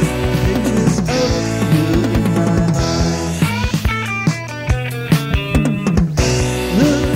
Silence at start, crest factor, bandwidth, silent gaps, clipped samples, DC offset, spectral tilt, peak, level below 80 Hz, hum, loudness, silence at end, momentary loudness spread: 0 s; 14 dB; 16.5 kHz; none; under 0.1%; under 0.1%; -6 dB/octave; 0 dBFS; -26 dBFS; none; -16 LUFS; 0 s; 4 LU